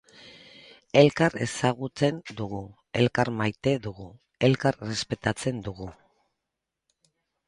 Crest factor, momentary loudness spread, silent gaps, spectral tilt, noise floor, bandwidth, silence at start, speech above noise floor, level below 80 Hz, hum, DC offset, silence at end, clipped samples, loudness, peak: 24 dB; 18 LU; none; -5.5 dB/octave; -85 dBFS; 11.5 kHz; 0.25 s; 59 dB; -56 dBFS; none; under 0.1%; 1.55 s; under 0.1%; -26 LUFS; -4 dBFS